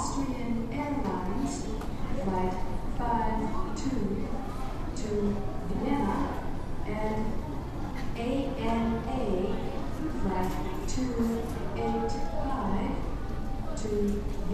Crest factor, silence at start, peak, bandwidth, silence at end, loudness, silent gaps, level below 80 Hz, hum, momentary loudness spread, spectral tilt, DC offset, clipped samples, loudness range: 16 dB; 0 s; -14 dBFS; 13.5 kHz; 0 s; -32 LUFS; none; -36 dBFS; none; 7 LU; -6.5 dB/octave; under 0.1%; under 0.1%; 1 LU